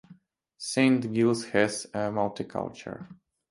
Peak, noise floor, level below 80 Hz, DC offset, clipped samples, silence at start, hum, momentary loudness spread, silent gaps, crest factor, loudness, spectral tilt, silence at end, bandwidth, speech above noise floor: -8 dBFS; -57 dBFS; -66 dBFS; under 0.1%; under 0.1%; 0.1 s; none; 16 LU; none; 20 dB; -27 LUFS; -5 dB/octave; 0.35 s; 11.5 kHz; 29 dB